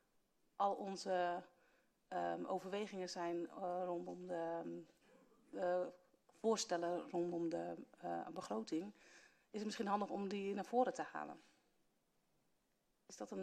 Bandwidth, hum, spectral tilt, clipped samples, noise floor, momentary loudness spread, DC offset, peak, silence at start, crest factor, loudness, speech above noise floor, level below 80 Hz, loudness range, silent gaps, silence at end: 13 kHz; none; -4.5 dB/octave; under 0.1%; -82 dBFS; 12 LU; under 0.1%; -24 dBFS; 0.6 s; 20 dB; -43 LUFS; 39 dB; -88 dBFS; 2 LU; none; 0 s